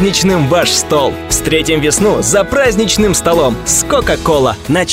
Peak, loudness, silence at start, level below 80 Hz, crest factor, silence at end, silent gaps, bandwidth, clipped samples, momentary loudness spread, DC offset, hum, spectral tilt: 0 dBFS; -11 LUFS; 0 s; -28 dBFS; 10 dB; 0 s; none; 16.5 kHz; under 0.1%; 3 LU; under 0.1%; none; -3.5 dB/octave